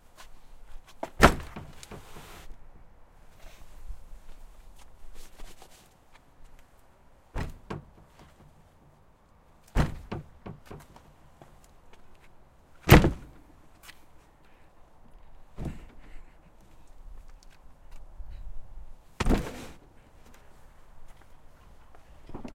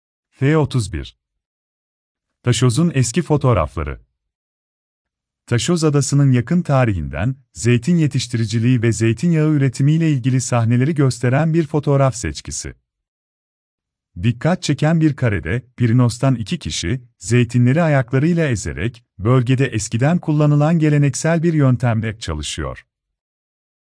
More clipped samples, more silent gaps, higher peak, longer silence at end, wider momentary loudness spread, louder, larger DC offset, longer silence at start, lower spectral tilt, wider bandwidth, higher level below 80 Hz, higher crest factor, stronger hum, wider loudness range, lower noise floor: neither; second, none vs 1.46-2.15 s, 4.35-5.05 s, 13.08-13.78 s; first, 0 dBFS vs -4 dBFS; second, 0 s vs 1.05 s; first, 31 LU vs 10 LU; second, -27 LUFS vs -17 LUFS; neither; second, 0.2 s vs 0.4 s; about the same, -5.5 dB/octave vs -6.5 dB/octave; first, 16 kHz vs 10.5 kHz; about the same, -38 dBFS vs -40 dBFS; first, 32 dB vs 14 dB; neither; first, 25 LU vs 4 LU; second, -59 dBFS vs under -90 dBFS